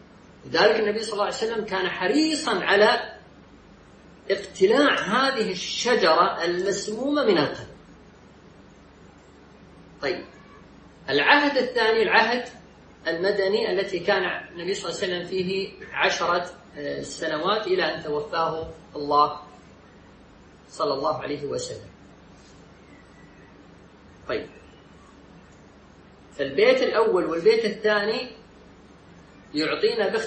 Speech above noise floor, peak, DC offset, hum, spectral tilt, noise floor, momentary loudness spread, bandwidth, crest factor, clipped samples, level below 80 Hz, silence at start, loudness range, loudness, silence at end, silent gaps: 27 dB; -2 dBFS; under 0.1%; none; -3.5 dB/octave; -50 dBFS; 14 LU; 8.8 kHz; 22 dB; under 0.1%; -58 dBFS; 0.45 s; 15 LU; -23 LUFS; 0 s; none